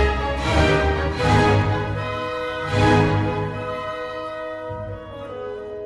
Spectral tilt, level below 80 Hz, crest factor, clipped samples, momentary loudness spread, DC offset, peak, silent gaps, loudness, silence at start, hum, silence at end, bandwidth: -6.5 dB/octave; -32 dBFS; 18 dB; under 0.1%; 15 LU; under 0.1%; -4 dBFS; none; -21 LUFS; 0 s; none; 0 s; 11.5 kHz